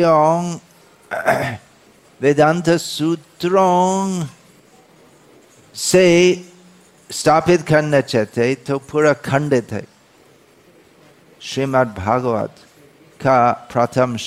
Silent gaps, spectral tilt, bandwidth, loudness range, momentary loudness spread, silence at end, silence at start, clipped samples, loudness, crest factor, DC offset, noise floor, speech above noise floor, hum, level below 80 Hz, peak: none; -5 dB/octave; 15.5 kHz; 6 LU; 14 LU; 0 s; 0 s; under 0.1%; -17 LUFS; 14 dB; under 0.1%; -50 dBFS; 34 dB; none; -56 dBFS; -4 dBFS